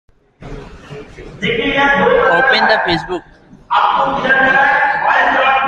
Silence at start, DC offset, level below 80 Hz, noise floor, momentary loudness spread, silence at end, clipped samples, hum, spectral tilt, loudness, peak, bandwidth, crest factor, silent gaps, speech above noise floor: 0.4 s; under 0.1%; -40 dBFS; -33 dBFS; 22 LU; 0 s; under 0.1%; none; -5 dB/octave; -12 LUFS; 0 dBFS; 9 kHz; 14 dB; none; 20 dB